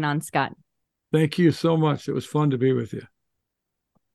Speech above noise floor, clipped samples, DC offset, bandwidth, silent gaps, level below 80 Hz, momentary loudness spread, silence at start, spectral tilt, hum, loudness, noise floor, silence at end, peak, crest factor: 59 dB; under 0.1%; under 0.1%; 12.5 kHz; none; -66 dBFS; 9 LU; 0 s; -7 dB/octave; none; -23 LUFS; -82 dBFS; 1.1 s; -6 dBFS; 18 dB